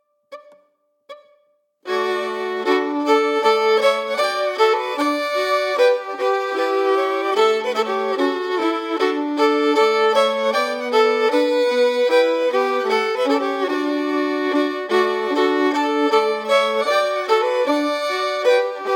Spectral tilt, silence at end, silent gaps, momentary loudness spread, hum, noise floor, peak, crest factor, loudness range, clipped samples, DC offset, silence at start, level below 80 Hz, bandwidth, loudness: -2.5 dB/octave; 0 s; none; 5 LU; none; -63 dBFS; -4 dBFS; 14 dB; 2 LU; under 0.1%; under 0.1%; 0.3 s; -88 dBFS; 17 kHz; -19 LUFS